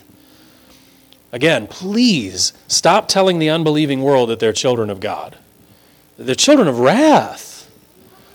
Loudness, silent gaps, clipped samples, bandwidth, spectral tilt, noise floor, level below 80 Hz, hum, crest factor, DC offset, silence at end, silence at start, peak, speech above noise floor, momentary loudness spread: -15 LUFS; none; under 0.1%; 19 kHz; -4 dB/octave; -49 dBFS; -58 dBFS; none; 16 dB; under 0.1%; 0.75 s; 1.35 s; 0 dBFS; 35 dB; 17 LU